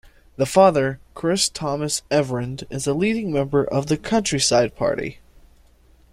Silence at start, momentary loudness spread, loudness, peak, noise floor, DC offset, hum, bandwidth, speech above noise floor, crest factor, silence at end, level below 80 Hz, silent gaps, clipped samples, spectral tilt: 0.4 s; 11 LU; -21 LUFS; -2 dBFS; -53 dBFS; under 0.1%; none; 15.5 kHz; 33 dB; 20 dB; 1 s; -48 dBFS; none; under 0.1%; -4.5 dB/octave